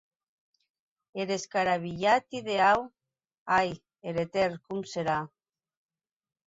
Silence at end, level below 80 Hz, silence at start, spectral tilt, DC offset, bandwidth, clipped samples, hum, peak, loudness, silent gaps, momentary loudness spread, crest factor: 1.2 s; -64 dBFS; 1.15 s; -4.5 dB/octave; under 0.1%; 8 kHz; under 0.1%; none; -12 dBFS; -29 LUFS; 3.38-3.46 s; 15 LU; 20 dB